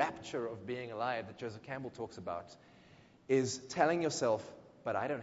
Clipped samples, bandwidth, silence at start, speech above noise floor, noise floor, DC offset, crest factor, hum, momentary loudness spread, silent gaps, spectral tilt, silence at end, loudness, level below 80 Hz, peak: under 0.1%; 7.6 kHz; 0 s; 25 dB; -62 dBFS; under 0.1%; 22 dB; none; 13 LU; none; -4 dB/octave; 0 s; -37 LUFS; -70 dBFS; -14 dBFS